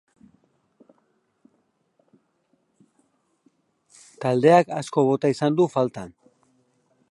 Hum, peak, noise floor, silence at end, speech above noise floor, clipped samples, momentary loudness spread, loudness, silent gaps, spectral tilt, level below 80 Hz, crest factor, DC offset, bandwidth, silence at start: none; -2 dBFS; -69 dBFS; 1.05 s; 49 dB; under 0.1%; 13 LU; -21 LUFS; none; -7 dB/octave; -70 dBFS; 22 dB; under 0.1%; 11.5 kHz; 4.2 s